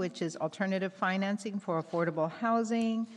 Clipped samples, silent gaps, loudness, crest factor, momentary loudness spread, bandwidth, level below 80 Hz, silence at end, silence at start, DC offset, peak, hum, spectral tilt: under 0.1%; none; -32 LUFS; 14 dB; 6 LU; 11 kHz; -82 dBFS; 0 s; 0 s; under 0.1%; -18 dBFS; none; -6 dB/octave